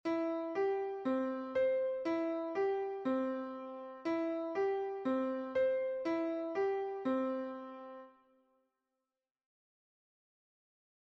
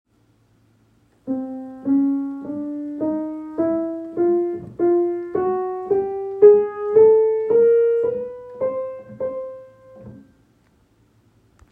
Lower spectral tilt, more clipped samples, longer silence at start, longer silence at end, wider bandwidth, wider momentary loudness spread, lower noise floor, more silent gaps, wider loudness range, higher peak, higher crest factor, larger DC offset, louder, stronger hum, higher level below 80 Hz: second, -6.5 dB/octave vs -10.5 dB/octave; neither; second, 0.05 s vs 1.25 s; first, 2.95 s vs 1.5 s; first, 7.2 kHz vs 2.8 kHz; second, 10 LU vs 16 LU; first, under -90 dBFS vs -60 dBFS; neither; second, 7 LU vs 10 LU; second, -24 dBFS vs -2 dBFS; second, 14 dB vs 20 dB; neither; second, -36 LUFS vs -20 LUFS; neither; second, -80 dBFS vs -62 dBFS